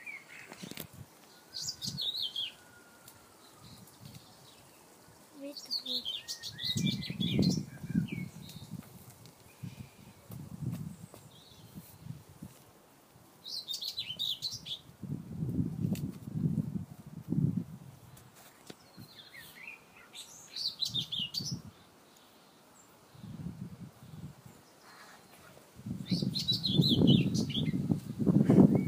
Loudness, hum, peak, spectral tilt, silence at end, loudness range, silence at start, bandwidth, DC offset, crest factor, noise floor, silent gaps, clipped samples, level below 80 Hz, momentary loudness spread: -33 LUFS; none; -10 dBFS; -5.5 dB/octave; 0 s; 16 LU; 0 s; 15.5 kHz; under 0.1%; 26 dB; -60 dBFS; none; under 0.1%; -64 dBFS; 24 LU